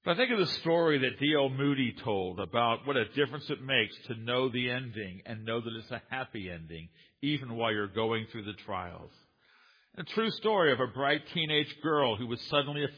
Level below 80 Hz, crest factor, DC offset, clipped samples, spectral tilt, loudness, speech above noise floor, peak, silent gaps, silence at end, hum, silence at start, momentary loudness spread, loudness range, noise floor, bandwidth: -68 dBFS; 22 dB; under 0.1%; under 0.1%; -7 dB/octave; -31 LUFS; 33 dB; -10 dBFS; none; 0 s; none; 0.05 s; 13 LU; 6 LU; -64 dBFS; 5.2 kHz